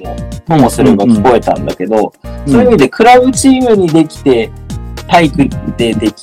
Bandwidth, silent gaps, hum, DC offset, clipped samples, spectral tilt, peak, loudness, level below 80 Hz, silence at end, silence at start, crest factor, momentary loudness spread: 15.5 kHz; none; none; under 0.1%; 2%; -5.5 dB/octave; 0 dBFS; -9 LUFS; -28 dBFS; 0 s; 0 s; 10 dB; 15 LU